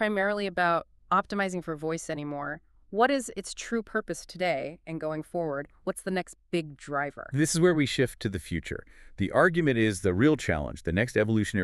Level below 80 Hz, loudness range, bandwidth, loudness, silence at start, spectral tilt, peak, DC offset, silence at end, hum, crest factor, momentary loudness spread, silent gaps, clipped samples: -52 dBFS; 6 LU; 13.5 kHz; -28 LUFS; 0 s; -5.5 dB/octave; -8 dBFS; under 0.1%; 0 s; none; 20 dB; 12 LU; none; under 0.1%